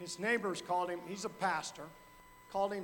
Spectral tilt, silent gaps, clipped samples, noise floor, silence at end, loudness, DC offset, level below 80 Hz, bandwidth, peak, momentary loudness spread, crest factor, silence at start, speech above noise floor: -3.5 dB/octave; none; under 0.1%; -58 dBFS; 0 s; -37 LUFS; under 0.1%; -70 dBFS; 19 kHz; -20 dBFS; 16 LU; 18 dB; 0 s; 21 dB